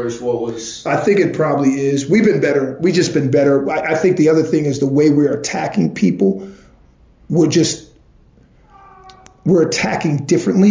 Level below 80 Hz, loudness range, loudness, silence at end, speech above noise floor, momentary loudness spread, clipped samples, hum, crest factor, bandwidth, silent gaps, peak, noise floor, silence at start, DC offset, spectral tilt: -52 dBFS; 5 LU; -15 LUFS; 0 s; 34 dB; 7 LU; under 0.1%; none; 14 dB; 7.6 kHz; none; -2 dBFS; -49 dBFS; 0 s; under 0.1%; -6 dB/octave